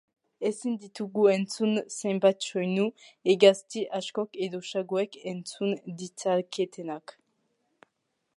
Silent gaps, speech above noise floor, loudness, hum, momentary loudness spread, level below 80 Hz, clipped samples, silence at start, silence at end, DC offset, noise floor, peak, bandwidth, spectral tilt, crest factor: none; 51 dB; -28 LUFS; none; 13 LU; -84 dBFS; under 0.1%; 0.4 s; 1.4 s; under 0.1%; -79 dBFS; -6 dBFS; 11.5 kHz; -5 dB/octave; 22 dB